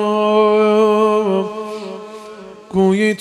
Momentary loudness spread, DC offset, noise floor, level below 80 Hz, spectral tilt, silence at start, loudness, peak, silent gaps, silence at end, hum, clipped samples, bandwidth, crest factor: 20 LU; under 0.1%; -35 dBFS; -56 dBFS; -6.5 dB/octave; 0 s; -15 LUFS; -2 dBFS; none; 0.05 s; none; under 0.1%; 11 kHz; 14 dB